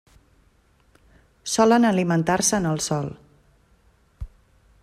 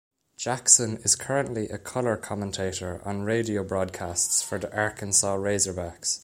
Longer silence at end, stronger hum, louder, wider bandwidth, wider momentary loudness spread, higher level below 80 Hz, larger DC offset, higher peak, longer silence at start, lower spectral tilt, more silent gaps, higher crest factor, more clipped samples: first, 0.55 s vs 0.05 s; neither; first, -21 LUFS vs -25 LUFS; second, 14 kHz vs 16 kHz; first, 25 LU vs 14 LU; first, -48 dBFS vs -56 dBFS; neither; second, -6 dBFS vs -2 dBFS; first, 1.45 s vs 0.4 s; first, -4.5 dB/octave vs -2.5 dB/octave; neither; second, 18 dB vs 24 dB; neither